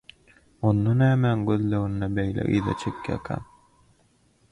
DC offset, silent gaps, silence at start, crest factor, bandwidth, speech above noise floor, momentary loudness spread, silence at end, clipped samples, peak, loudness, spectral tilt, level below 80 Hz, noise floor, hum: under 0.1%; none; 0.6 s; 16 dB; 10.5 kHz; 40 dB; 11 LU; 1.1 s; under 0.1%; -10 dBFS; -25 LUFS; -8.5 dB/octave; -48 dBFS; -63 dBFS; none